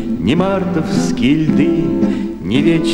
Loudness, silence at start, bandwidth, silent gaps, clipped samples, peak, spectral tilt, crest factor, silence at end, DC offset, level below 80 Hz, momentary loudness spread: -15 LUFS; 0 s; 12 kHz; none; under 0.1%; 0 dBFS; -6.5 dB/octave; 14 dB; 0 s; under 0.1%; -36 dBFS; 4 LU